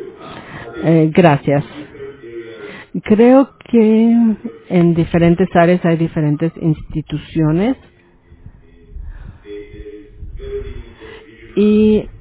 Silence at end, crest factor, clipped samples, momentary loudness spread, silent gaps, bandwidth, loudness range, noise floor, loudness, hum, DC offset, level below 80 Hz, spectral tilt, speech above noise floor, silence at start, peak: 0.05 s; 16 dB; under 0.1%; 22 LU; none; 4 kHz; 16 LU; -46 dBFS; -14 LUFS; none; under 0.1%; -38 dBFS; -12 dB/octave; 34 dB; 0 s; 0 dBFS